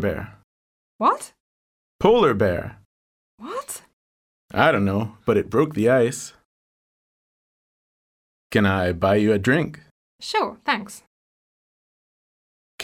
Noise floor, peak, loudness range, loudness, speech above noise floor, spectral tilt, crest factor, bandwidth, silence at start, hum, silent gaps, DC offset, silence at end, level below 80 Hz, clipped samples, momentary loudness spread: under -90 dBFS; -2 dBFS; 3 LU; -21 LUFS; over 69 dB; -5.5 dB/octave; 22 dB; 16.5 kHz; 0 s; none; 0.44-0.99 s, 1.40-1.99 s, 2.85-3.38 s, 3.93-4.49 s, 6.45-8.50 s, 9.91-10.19 s, 11.07-12.78 s; under 0.1%; 0 s; -52 dBFS; under 0.1%; 18 LU